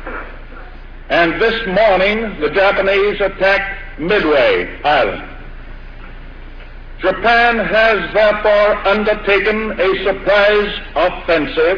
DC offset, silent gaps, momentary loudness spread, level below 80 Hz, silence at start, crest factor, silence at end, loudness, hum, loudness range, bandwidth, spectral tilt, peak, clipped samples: under 0.1%; none; 8 LU; -32 dBFS; 0 s; 14 dB; 0 s; -14 LUFS; none; 4 LU; 5.4 kHz; -6 dB/octave; 0 dBFS; under 0.1%